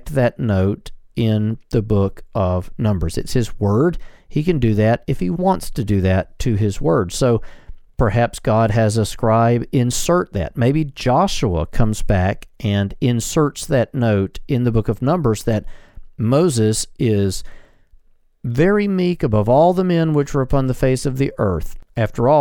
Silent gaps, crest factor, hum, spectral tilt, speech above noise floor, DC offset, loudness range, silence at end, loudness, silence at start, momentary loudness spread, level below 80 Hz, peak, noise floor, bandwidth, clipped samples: none; 16 dB; none; -6.5 dB/octave; 33 dB; under 0.1%; 2 LU; 0 s; -18 LUFS; 0 s; 7 LU; -32 dBFS; -2 dBFS; -50 dBFS; 17.5 kHz; under 0.1%